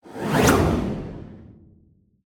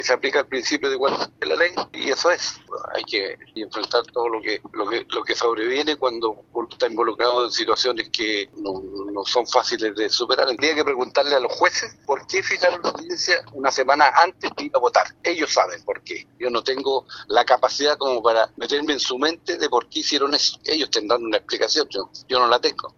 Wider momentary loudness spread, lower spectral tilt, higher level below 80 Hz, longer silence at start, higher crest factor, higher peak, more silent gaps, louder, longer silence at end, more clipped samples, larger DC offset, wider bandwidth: first, 22 LU vs 9 LU; first, -5.5 dB/octave vs -1.5 dB/octave; first, -38 dBFS vs -64 dBFS; about the same, 0.05 s vs 0 s; about the same, 20 dB vs 22 dB; second, -4 dBFS vs 0 dBFS; neither; about the same, -21 LUFS vs -21 LUFS; first, 0.75 s vs 0.1 s; neither; neither; first, 19 kHz vs 7.8 kHz